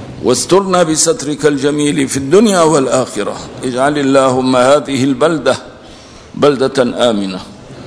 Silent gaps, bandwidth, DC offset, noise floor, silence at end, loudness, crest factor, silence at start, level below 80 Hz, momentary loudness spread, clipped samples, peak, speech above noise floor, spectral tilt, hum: none; 11 kHz; 0.1%; -35 dBFS; 0 s; -12 LUFS; 12 dB; 0 s; -46 dBFS; 11 LU; 0.6%; 0 dBFS; 24 dB; -4.5 dB/octave; none